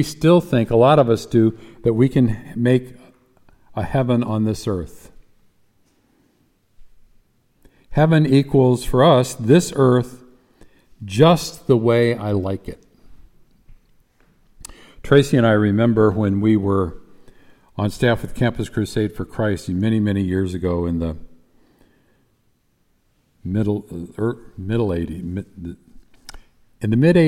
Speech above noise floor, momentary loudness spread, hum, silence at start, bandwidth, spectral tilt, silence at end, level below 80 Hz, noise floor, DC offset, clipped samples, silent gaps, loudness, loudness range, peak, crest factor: 46 dB; 15 LU; none; 0 s; 16 kHz; -7 dB/octave; 0 s; -44 dBFS; -63 dBFS; under 0.1%; under 0.1%; none; -18 LUFS; 10 LU; -2 dBFS; 18 dB